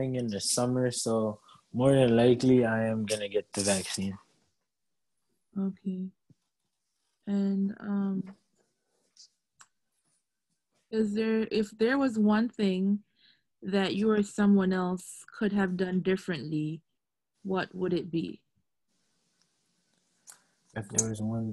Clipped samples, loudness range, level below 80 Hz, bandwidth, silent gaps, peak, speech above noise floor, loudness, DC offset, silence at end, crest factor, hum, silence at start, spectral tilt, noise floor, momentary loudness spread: under 0.1%; 11 LU; -64 dBFS; 12.5 kHz; none; -10 dBFS; 59 dB; -29 LUFS; under 0.1%; 0 s; 20 dB; none; 0 s; -5 dB/octave; -87 dBFS; 15 LU